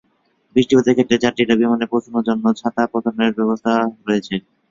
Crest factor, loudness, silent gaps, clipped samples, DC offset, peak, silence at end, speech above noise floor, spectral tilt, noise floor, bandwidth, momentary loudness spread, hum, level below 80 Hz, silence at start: 16 dB; -18 LUFS; none; under 0.1%; under 0.1%; -2 dBFS; 0.3 s; 45 dB; -5.5 dB/octave; -62 dBFS; 7.6 kHz; 6 LU; none; -56 dBFS; 0.55 s